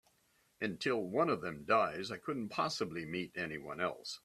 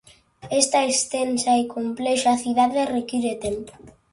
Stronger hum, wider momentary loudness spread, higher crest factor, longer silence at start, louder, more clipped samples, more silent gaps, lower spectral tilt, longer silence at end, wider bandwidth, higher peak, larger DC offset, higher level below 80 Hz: neither; about the same, 9 LU vs 9 LU; about the same, 20 dB vs 22 dB; first, 0.6 s vs 0.45 s; second, -37 LUFS vs -22 LUFS; neither; neither; first, -5 dB/octave vs -2.5 dB/octave; second, 0.05 s vs 0.2 s; first, 14 kHz vs 11.5 kHz; second, -18 dBFS vs 0 dBFS; neither; second, -74 dBFS vs -56 dBFS